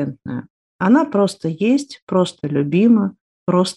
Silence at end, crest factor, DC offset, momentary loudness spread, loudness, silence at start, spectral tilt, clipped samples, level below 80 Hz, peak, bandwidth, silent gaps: 0.05 s; 14 dB; under 0.1%; 13 LU; -18 LUFS; 0 s; -6.5 dB/octave; under 0.1%; -62 dBFS; -2 dBFS; 11.5 kHz; 0.50-0.79 s, 2.02-2.07 s, 3.21-3.46 s